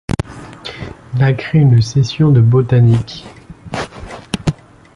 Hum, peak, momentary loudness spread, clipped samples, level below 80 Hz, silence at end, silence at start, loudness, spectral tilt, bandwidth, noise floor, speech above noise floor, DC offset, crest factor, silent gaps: none; -2 dBFS; 19 LU; under 0.1%; -36 dBFS; 0.45 s; 0.1 s; -14 LUFS; -7.5 dB/octave; 11.5 kHz; -31 dBFS; 20 dB; under 0.1%; 14 dB; none